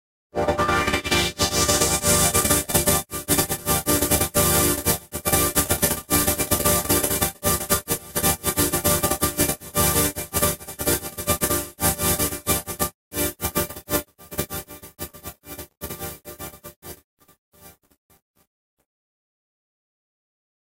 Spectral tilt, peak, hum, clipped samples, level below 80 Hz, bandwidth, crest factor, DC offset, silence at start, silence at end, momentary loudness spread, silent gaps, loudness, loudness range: -3 dB/octave; 0 dBFS; none; under 0.1%; -40 dBFS; 16.5 kHz; 24 dB; under 0.1%; 0.35 s; 3.1 s; 17 LU; 12.94-13.11 s, 15.77-15.81 s, 16.76-16.82 s, 17.04-17.17 s, 17.38-17.52 s; -21 LUFS; 16 LU